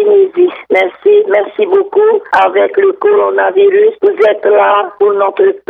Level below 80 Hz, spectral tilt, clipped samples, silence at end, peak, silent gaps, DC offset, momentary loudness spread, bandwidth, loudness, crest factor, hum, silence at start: -62 dBFS; -5.5 dB/octave; under 0.1%; 0.1 s; 0 dBFS; none; under 0.1%; 4 LU; 4.3 kHz; -10 LUFS; 8 dB; none; 0 s